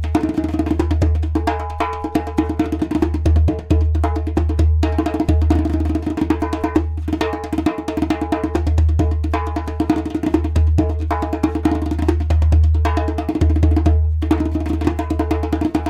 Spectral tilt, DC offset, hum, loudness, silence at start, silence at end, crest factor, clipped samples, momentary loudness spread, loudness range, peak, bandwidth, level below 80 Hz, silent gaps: -8.5 dB/octave; under 0.1%; none; -19 LUFS; 0 s; 0 s; 16 dB; under 0.1%; 5 LU; 2 LU; -2 dBFS; 8.8 kHz; -24 dBFS; none